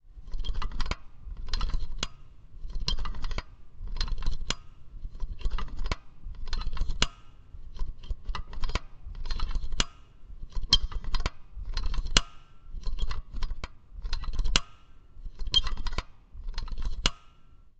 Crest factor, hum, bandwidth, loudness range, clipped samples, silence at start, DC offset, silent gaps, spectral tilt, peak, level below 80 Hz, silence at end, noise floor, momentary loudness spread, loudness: 28 dB; none; 8.8 kHz; 7 LU; under 0.1%; 0.05 s; under 0.1%; none; -2.5 dB/octave; 0 dBFS; -32 dBFS; 0.1 s; -52 dBFS; 21 LU; -33 LUFS